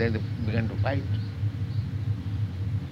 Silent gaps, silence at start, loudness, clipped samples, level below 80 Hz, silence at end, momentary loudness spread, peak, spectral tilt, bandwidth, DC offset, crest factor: none; 0 s; -30 LUFS; under 0.1%; -44 dBFS; 0 s; 4 LU; -14 dBFS; -8.5 dB/octave; 6 kHz; under 0.1%; 14 dB